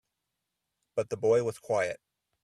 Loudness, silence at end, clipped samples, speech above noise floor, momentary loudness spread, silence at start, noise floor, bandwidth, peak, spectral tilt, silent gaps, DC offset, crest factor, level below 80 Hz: -30 LUFS; 0.45 s; under 0.1%; 56 dB; 10 LU; 0.95 s; -85 dBFS; 12.5 kHz; -16 dBFS; -5.5 dB/octave; none; under 0.1%; 16 dB; -70 dBFS